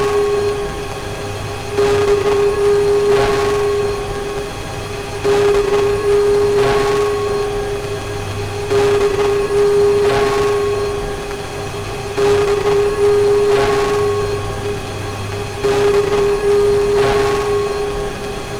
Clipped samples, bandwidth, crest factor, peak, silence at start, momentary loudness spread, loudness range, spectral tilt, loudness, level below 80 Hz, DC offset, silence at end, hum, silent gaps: under 0.1%; 14.5 kHz; 12 dB; -2 dBFS; 0 s; 11 LU; 1 LU; -5 dB/octave; -16 LUFS; -32 dBFS; under 0.1%; 0 s; none; none